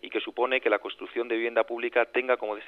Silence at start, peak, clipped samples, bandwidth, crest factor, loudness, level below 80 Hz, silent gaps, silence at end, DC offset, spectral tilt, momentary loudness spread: 0.05 s; -8 dBFS; under 0.1%; 4.9 kHz; 20 dB; -27 LUFS; -76 dBFS; none; 0 s; under 0.1%; -4.5 dB/octave; 7 LU